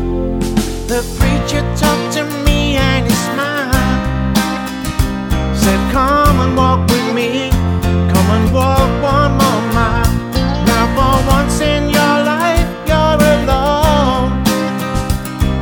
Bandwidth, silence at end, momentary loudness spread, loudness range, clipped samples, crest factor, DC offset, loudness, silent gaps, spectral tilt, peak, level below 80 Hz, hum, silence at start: over 20 kHz; 0 s; 6 LU; 2 LU; under 0.1%; 12 dB; under 0.1%; -14 LUFS; none; -5.5 dB/octave; 0 dBFS; -20 dBFS; none; 0 s